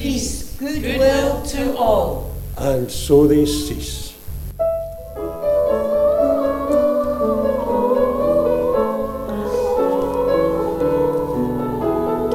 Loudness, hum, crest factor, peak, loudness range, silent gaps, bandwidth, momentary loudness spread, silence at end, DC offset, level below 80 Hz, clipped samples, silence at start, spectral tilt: -19 LUFS; none; 16 dB; -2 dBFS; 2 LU; none; 17 kHz; 10 LU; 0 s; under 0.1%; -34 dBFS; under 0.1%; 0 s; -5.5 dB/octave